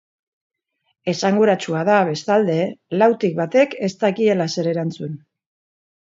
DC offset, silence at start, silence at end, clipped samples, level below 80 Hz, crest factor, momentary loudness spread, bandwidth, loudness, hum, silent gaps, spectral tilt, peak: under 0.1%; 1.05 s; 0.95 s; under 0.1%; -68 dBFS; 18 dB; 10 LU; 7.8 kHz; -19 LUFS; none; none; -6 dB/octave; -2 dBFS